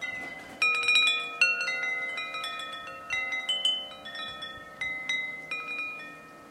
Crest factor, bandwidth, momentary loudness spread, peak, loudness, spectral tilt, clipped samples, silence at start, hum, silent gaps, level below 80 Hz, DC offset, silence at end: 22 dB; 16 kHz; 17 LU; -10 dBFS; -28 LUFS; 0 dB/octave; under 0.1%; 0 s; none; none; -70 dBFS; under 0.1%; 0 s